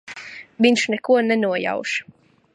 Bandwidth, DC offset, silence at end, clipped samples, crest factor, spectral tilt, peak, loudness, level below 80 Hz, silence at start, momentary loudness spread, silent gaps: 11 kHz; under 0.1%; 0.5 s; under 0.1%; 20 dB; -4 dB/octave; -2 dBFS; -20 LUFS; -72 dBFS; 0.05 s; 18 LU; none